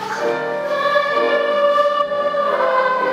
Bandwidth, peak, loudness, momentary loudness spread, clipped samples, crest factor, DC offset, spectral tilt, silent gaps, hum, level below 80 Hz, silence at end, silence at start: 13 kHz; -2 dBFS; -17 LUFS; 5 LU; under 0.1%; 14 dB; under 0.1%; -3.5 dB/octave; none; none; -62 dBFS; 0 s; 0 s